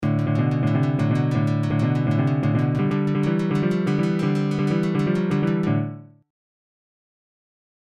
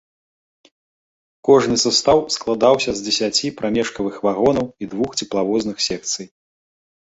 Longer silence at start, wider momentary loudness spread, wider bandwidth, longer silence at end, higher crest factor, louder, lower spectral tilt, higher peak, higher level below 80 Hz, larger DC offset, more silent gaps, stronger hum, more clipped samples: second, 0 s vs 1.45 s; second, 1 LU vs 9 LU; about the same, 9 kHz vs 8.2 kHz; first, 1.75 s vs 0.8 s; second, 12 dB vs 20 dB; second, -22 LUFS vs -18 LUFS; first, -8.5 dB/octave vs -3.5 dB/octave; second, -10 dBFS vs 0 dBFS; about the same, -52 dBFS vs -52 dBFS; neither; neither; neither; neither